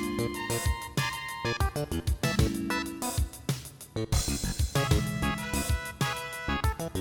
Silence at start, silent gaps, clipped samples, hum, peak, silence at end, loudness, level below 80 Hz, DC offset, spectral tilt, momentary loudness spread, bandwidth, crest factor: 0 s; none; under 0.1%; none; -12 dBFS; 0 s; -31 LUFS; -36 dBFS; under 0.1%; -4.5 dB/octave; 6 LU; 19.5 kHz; 18 dB